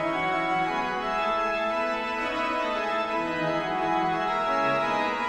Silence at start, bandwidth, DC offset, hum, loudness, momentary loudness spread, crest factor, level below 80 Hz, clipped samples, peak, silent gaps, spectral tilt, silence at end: 0 s; 12 kHz; under 0.1%; none; -26 LUFS; 3 LU; 14 dB; -54 dBFS; under 0.1%; -14 dBFS; none; -5 dB/octave; 0 s